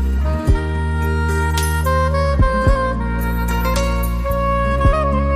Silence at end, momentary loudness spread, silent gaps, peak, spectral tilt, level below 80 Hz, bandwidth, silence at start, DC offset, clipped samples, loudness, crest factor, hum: 0 s; 4 LU; none; -2 dBFS; -6.5 dB/octave; -20 dBFS; 15.5 kHz; 0 s; under 0.1%; under 0.1%; -18 LUFS; 14 dB; none